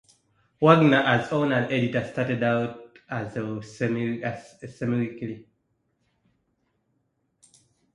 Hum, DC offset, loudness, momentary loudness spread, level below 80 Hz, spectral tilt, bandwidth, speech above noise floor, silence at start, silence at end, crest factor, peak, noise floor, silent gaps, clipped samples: none; under 0.1%; -24 LUFS; 18 LU; -64 dBFS; -7 dB/octave; 11 kHz; 49 dB; 0.6 s; 2.55 s; 24 dB; -2 dBFS; -73 dBFS; none; under 0.1%